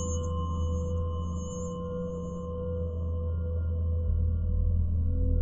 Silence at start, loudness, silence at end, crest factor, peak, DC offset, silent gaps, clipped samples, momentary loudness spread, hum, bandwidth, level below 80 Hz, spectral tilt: 0 s; -32 LUFS; 0 s; 12 dB; -16 dBFS; under 0.1%; none; under 0.1%; 6 LU; none; 7.6 kHz; -34 dBFS; -8 dB/octave